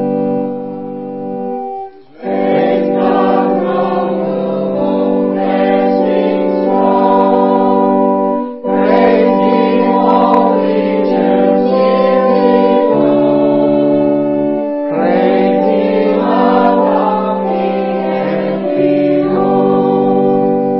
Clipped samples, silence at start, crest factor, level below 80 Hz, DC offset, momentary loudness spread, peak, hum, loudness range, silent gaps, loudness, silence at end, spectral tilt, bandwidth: under 0.1%; 0 s; 12 dB; -58 dBFS; 0.6%; 7 LU; 0 dBFS; none; 3 LU; none; -12 LUFS; 0 s; -10.5 dB/octave; 5.8 kHz